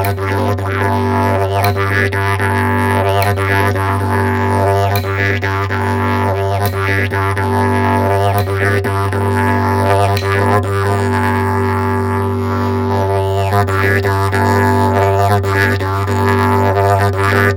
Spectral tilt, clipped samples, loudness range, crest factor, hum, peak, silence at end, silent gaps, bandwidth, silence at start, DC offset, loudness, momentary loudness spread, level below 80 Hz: -6.5 dB/octave; under 0.1%; 2 LU; 12 dB; none; 0 dBFS; 0 s; none; 17 kHz; 0 s; under 0.1%; -14 LUFS; 4 LU; -46 dBFS